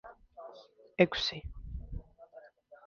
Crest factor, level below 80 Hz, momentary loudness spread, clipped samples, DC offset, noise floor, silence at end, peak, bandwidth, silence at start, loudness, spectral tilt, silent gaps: 28 dB; -50 dBFS; 27 LU; under 0.1%; under 0.1%; -56 dBFS; 0.1 s; -8 dBFS; 7.2 kHz; 0.05 s; -32 LUFS; -3.5 dB/octave; none